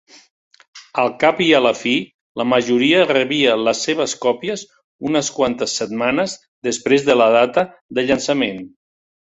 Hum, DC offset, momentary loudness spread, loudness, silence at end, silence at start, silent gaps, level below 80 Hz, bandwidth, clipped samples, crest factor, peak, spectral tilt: none; under 0.1%; 11 LU; -17 LUFS; 0.65 s; 0.75 s; 2.14-2.35 s, 4.84-4.99 s, 6.48-6.62 s, 7.81-7.89 s; -56 dBFS; 8.4 kHz; under 0.1%; 18 dB; 0 dBFS; -3.5 dB/octave